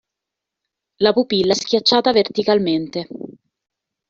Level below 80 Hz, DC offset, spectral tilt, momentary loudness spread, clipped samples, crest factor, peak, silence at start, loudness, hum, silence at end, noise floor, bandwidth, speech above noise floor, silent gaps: -58 dBFS; under 0.1%; -3 dB/octave; 16 LU; under 0.1%; 18 dB; -2 dBFS; 1 s; -17 LUFS; none; 0.8 s; -83 dBFS; 7.8 kHz; 66 dB; none